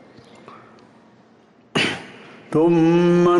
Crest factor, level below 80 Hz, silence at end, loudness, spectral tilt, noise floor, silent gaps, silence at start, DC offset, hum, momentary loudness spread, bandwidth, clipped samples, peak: 12 dB; -58 dBFS; 0 s; -18 LUFS; -6.5 dB/octave; -53 dBFS; none; 1.75 s; under 0.1%; none; 14 LU; 11 kHz; under 0.1%; -8 dBFS